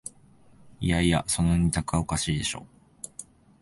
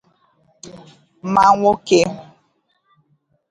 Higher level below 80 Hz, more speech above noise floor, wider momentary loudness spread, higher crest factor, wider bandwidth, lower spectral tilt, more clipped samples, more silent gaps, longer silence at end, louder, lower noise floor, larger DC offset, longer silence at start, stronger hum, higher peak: first, -40 dBFS vs -54 dBFS; second, 30 dB vs 49 dB; second, 18 LU vs 26 LU; about the same, 18 dB vs 20 dB; about the same, 12 kHz vs 11.5 kHz; about the same, -4.5 dB/octave vs -5 dB/octave; neither; neither; second, 0.4 s vs 1.3 s; second, -26 LUFS vs -15 LUFS; second, -55 dBFS vs -65 dBFS; neither; second, 0.05 s vs 0.65 s; neither; second, -10 dBFS vs 0 dBFS